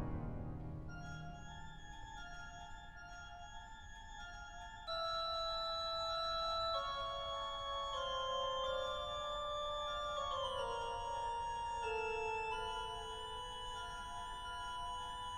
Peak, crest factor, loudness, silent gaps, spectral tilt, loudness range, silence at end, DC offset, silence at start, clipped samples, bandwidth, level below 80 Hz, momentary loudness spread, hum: -30 dBFS; 14 dB; -42 LUFS; none; -3.5 dB/octave; 12 LU; 0 s; under 0.1%; 0 s; under 0.1%; 15 kHz; -56 dBFS; 14 LU; none